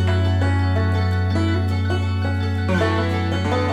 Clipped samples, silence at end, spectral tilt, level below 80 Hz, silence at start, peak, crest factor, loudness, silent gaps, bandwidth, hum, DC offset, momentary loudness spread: under 0.1%; 0 s; -7.5 dB/octave; -40 dBFS; 0 s; -6 dBFS; 12 dB; -20 LUFS; none; 8.6 kHz; none; under 0.1%; 3 LU